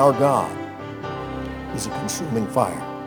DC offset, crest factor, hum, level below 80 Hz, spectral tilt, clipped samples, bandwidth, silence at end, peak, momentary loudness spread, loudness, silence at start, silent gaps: under 0.1%; 20 dB; none; -46 dBFS; -5.5 dB/octave; under 0.1%; over 20 kHz; 0 s; -2 dBFS; 12 LU; -24 LUFS; 0 s; none